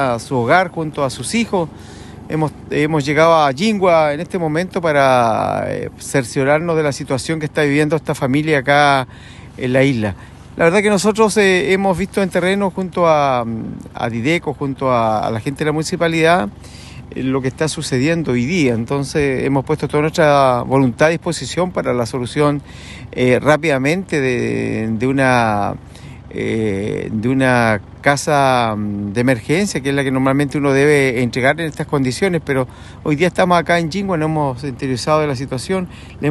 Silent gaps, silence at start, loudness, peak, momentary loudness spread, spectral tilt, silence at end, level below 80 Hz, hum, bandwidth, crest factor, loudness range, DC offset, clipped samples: none; 0 s; -16 LUFS; 0 dBFS; 11 LU; -5.5 dB/octave; 0 s; -44 dBFS; none; 12.5 kHz; 16 dB; 3 LU; under 0.1%; under 0.1%